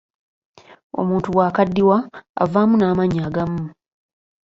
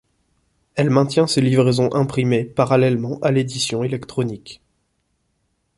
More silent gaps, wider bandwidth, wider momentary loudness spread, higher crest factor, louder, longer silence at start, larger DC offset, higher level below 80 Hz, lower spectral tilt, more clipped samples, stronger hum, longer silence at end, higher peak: first, 2.29-2.34 s vs none; second, 7.6 kHz vs 11.5 kHz; first, 13 LU vs 9 LU; about the same, 18 dB vs 18 dB; about the same, -19 LUFS vs -19 LUFS; first, 0.95 s vs 0.75 s; neither; first, -50 dBFS vs -56 dBFS; first, -9 dB/octave vs -6 dB/octave; neither; neither; second, 0.8 s vs 1.25 s; about the same, -2 dBFS vs -2 dBFS